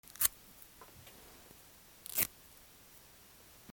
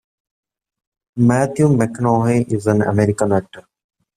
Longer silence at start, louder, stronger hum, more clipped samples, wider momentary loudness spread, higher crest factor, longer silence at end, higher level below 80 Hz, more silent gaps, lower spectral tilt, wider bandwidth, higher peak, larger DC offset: second, 0.2 s vs 1.15 s; second, -34 LUFS vs -17 LUFS; neither; neither; first, 24 LU vs 3 LU; first, 34 dB vs 16 dB; second, 0 s vs 0.55 s; second, -68 dBFS vs -50 dBFS; neither; second, -0.5 dB/octave vs -8 dB/octave; first, over 20 kHz vs 13.5 kHz; second, -10 dBFS vs -2 dBFS; neither